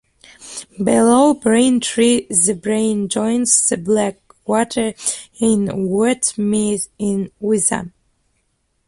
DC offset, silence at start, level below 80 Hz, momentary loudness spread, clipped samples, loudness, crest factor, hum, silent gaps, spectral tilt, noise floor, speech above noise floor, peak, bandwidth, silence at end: under 0.1%; 0.4 s; -52 dBFS; 9 LU; under 0.1%; -16 LUFS; 18 dB; none; none; -4 dB/octave; -66 dBFS; 50 dB; 0 dBFS; 11.5 kHz; 1 s